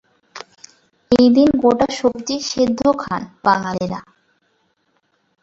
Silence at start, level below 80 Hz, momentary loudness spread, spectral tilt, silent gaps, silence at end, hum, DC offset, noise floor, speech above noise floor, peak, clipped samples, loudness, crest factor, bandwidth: 0.35 s; -50 dBFS; 21 LU; -5 dB/octave; none; 1.4 s; none; under 0.1%; -65 dBFS; 49 dB; -2 dBFS; under 0.1%; -17 LUFS; 18 dB; 7.8 kHz